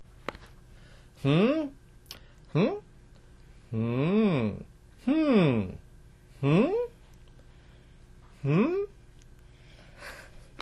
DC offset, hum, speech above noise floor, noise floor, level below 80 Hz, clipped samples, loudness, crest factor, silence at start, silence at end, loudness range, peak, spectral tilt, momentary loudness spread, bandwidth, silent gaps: under 0.1%; none; 28 dB; -53 dBFS; -54 dBFS; under 0.1%; -28 LUFS; 18 dB; 0 s; 0.2 s; 7 LU; -12 dBFS; -8.5 dB/octave; 22 LU; 13 kHz; none